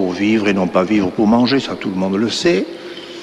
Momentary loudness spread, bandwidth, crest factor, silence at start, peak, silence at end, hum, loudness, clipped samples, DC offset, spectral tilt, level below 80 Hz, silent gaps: 9 LU; 11 kHz; 14 dB; 0 s; -2 dBFS; 0 s; none; -16 LUFS; under 0.1%; under 0.1%; -5.5 dB/octave; -50 dBFS; none